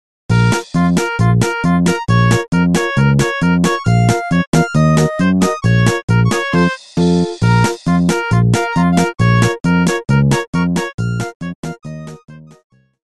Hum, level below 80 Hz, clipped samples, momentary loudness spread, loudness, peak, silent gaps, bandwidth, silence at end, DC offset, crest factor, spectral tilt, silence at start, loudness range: none; -36 dBFS; under 0.1%; 7 LU; -14 LUFS; 0 dBFS; 4.47-4.53 s, 6.03-6.08 s, 10.47-10.53 s, 10.94-10.98 s, 11.35-11.40 s, 11.55-11.63 s; 12.5 kHz; 0.65 s; 0.3%; 14 dB; -6 dB/octave; 0.3 s; 2 LU